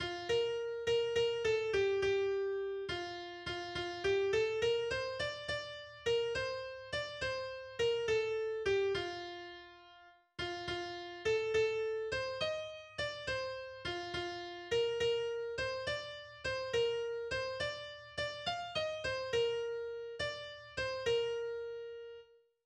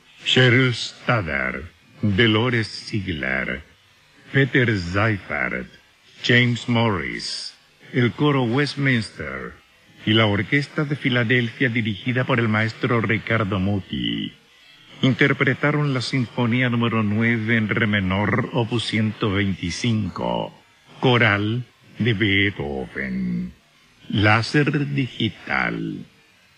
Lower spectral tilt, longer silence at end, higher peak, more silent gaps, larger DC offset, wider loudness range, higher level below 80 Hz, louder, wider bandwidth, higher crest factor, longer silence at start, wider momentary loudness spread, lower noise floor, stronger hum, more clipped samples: second, -3.5 dB/octave vs -6 dB/octave; second, 0.4 s vs 0.55 s; second, -22 dBFS vs -2 dBFS; neither; neither; about the same, 3 LU vs 2 LU; second, -62 dBFS vs -50 dBFS; second, -37 LUFS vs -21 LUFS; about the same, 9.8 kHz vs 10 kHz; second, 14 dB vs 20 dB; second, 0 s vs 0.2 s; about the same, 11 LU vs 11 LU; first, -61 dBFS vs -54 dBFS; neither; neither